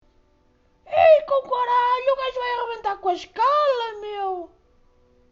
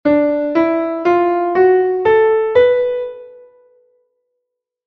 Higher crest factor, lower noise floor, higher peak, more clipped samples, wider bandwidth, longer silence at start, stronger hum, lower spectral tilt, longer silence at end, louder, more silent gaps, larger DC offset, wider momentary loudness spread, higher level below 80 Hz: about the same, 18 dB vs 14 dB; second, -61 dBFS vs -77 dBFS; about the same, -4 dBFS vs -2 dBFS; neither; first, 7.2 kHz vs 5.8 kHz; first, 0.9 s vs 0.05 s; neither; second, -4 dB/octave vs -7.5 dB/octave; second, 0.85 s vs 1.55 s; second, -21 LUFS vs -14 LUFS; neither; neither; first, 13 LU vs 5 LU; about the same, -58 dBFS vs -54 dBFS